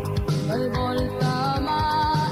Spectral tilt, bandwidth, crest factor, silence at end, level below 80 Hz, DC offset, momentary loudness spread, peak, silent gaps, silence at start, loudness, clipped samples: -6.5 dB/octave; 15.5 kHz; 10 dB; 0 s; -38 dBFS; under 0.1%; 3 LU; -12 dBFS; none; 0 s; -24 LUFS; under 0.1%